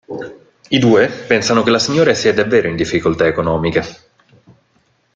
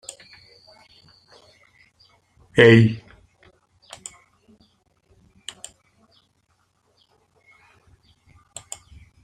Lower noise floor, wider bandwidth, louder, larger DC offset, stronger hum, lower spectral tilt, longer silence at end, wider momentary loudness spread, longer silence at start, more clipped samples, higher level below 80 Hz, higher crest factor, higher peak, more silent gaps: second, -59 dBFS vs -67 dBFS; second, 9.2 kHz vs 11 kHz; about the same, -14 LUFS vs -15 LUFS; neither; neither; about the same, -5 dB/octave vs -6 dB/octave; second, 1.2 s vs 6.25 s; second, 11 LU vs 29 LU; second, 0.1 s vs 2.55 s; neither; first, -46 dBFS vs -58 dBFS; second, 14 dB vs 24 dB; about the same, 0 dBFS vs -2 dBFS; neither